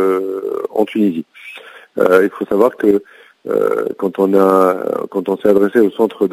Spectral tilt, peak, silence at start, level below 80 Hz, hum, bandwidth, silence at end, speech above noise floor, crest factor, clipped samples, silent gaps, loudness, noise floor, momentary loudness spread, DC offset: -7 dB/octave; 0 dBFS; 0 s; -58 dBFS; none; 16 kHz; 0 s; 22 dB; 14 dB; under 0.1%; none; -15 LUFS; -36 dBFS; 15 LU; under 0.1%